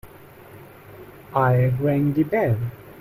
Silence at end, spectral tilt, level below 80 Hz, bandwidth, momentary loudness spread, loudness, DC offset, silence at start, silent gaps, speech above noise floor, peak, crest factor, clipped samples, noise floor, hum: 0 s; -10 dB/octave; -50 dBFS; 15.5 kHz; 24 LU; -21 LUFS; under 0.1%; 0.05 s; none; 25 dB; -8 dBFS; 16 dB; under 0.1%; -45 dBFS; none